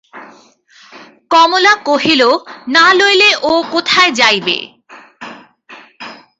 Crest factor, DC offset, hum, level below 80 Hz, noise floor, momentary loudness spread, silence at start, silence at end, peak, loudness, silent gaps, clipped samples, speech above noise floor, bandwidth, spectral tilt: 14 dB; under 0.1%; none; -58 dBFS; -45 dBFS; 24 LU; 0.15 s; 0.25 s; 0 dBFS; -10 LUFS; none; under 0.1%; 34 dB; 8 kHz; -2 dB/octave